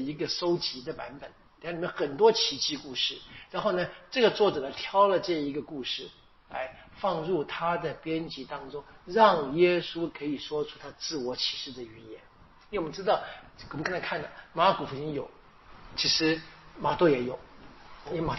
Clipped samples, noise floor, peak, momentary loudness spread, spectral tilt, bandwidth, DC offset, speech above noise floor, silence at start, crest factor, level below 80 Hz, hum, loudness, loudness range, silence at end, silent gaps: under 0.1%; -51 dBFS; -8 dBFS; 19 LU; -2.5 dB/octave; 6.2 kHz; under 0.1%; 22 dB; 0 s; 22 dB; -58 dBFS; none; -29 LUFS; 6 LU; 0 s; none